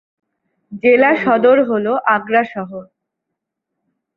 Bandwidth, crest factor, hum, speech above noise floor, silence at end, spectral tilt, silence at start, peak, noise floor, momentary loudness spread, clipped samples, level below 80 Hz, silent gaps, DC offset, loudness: 5.2 kHz; 16 dB; none; 65 dB; 1.35 s; -8 dB/octave; 0.7 s; -2 dBFS; -79 dBFS; 15 LU; under 0.1%; -62 dBFS; none; under 0.1%; -14 LUFS